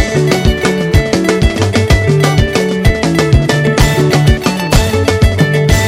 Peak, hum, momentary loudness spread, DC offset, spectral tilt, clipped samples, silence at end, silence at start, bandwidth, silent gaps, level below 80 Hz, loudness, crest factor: 0 dBFS; none; 2 LU; under 0.1%; -5.5 dB/octave; 0.6%; 0 s; 0 s; 16.5 kHz; none; -18 dBFS; -11 LUFS; 10 dB